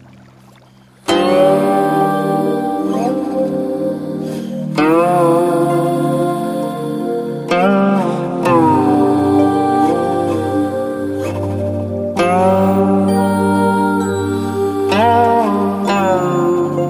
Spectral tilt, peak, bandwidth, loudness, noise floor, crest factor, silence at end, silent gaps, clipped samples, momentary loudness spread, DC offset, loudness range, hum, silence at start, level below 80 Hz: -7 dB/octave; 0 dBFS; 15.5 kHz; -15 LUFS; -45 dBFS; 14 dB; 0 s; none; under 0.1%; 8 LU; under 0.1%; 2 LU; none; 1.05 s; -54 dBFS